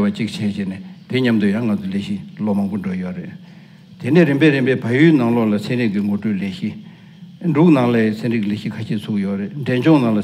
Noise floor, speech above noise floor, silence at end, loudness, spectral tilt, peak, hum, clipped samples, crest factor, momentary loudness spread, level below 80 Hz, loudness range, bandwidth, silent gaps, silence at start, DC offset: -40 dBFS; 23 dB; 0 s; -18 LUFS; -8 dB/octave; 0 dBFS; none; under 0.1%; 18 dB; 14 LU; -64 dBFS; 5 LU; 14 kHz; none; 0 s; under 0.1%